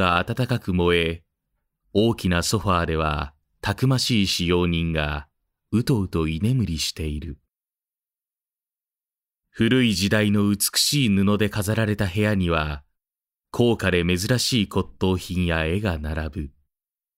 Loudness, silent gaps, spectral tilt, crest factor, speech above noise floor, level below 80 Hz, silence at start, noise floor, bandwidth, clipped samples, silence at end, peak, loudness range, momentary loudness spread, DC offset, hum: -22 LUFS; none; -5 dB/octave; 18 dB; over 68 dB; -40 dBFS; 0 s; under -90 dBFS; 16 kHz; under 0.1%; 0.7 s; -6 dBFS; 6 LU; 10 LU; under 0.1%; none